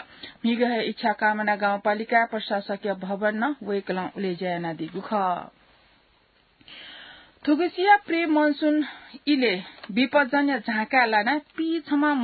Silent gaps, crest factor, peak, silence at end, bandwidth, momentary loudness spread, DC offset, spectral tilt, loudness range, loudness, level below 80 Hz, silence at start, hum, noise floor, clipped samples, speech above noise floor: none; 20 dB; -6 dBFS; 0 s; 4.8 kHz; 11 LU; under 0.1%; -9.5 dB/octave; 8 LU; -24 LUFS; -70 dBFS; 0 s; none; -62 dBFS; under 0.1%; 38 dB